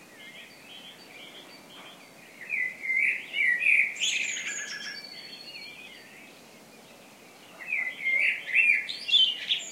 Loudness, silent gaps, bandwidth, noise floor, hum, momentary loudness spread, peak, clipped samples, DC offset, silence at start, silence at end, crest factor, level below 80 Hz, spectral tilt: -25 LUFS; none; 16 kHz; -51 dBFS; none; 25 LU; -10 dBFS; under 0.1%; under 0.1%; 0 s; 0 s; 20 dB; -82 dBFS; 1.5 dB/octave